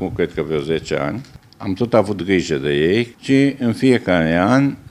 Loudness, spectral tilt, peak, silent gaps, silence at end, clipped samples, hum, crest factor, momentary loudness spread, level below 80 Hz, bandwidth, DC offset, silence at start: -18 LUFS; -6.5 dB/octave; 0 dBFS; none; 0.15 s; under 0.1%; none; 18 dB; 8 LU; -46 dBFS; 11.5 kHz; under 0.1%; 0 s